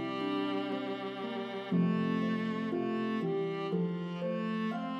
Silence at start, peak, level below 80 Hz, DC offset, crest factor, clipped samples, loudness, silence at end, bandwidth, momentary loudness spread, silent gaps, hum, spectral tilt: 0 s; -20 dBFS; -80 dBFS; under 0.1%; 14 dB; under 0.1%; -34 LUFS; 0 s; 7 kHz; 7 LU; none; none; -8 dB/octave